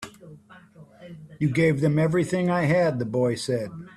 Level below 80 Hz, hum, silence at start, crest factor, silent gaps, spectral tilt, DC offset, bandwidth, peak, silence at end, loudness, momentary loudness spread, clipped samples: -58 dBFS; none; 0 s; 14 dB; none; -7 dB/octave; under 0.1%; 12.5 kHz; -10 dBFS; 0.1 s; -23 LUFS; 21 LU; under 0.1%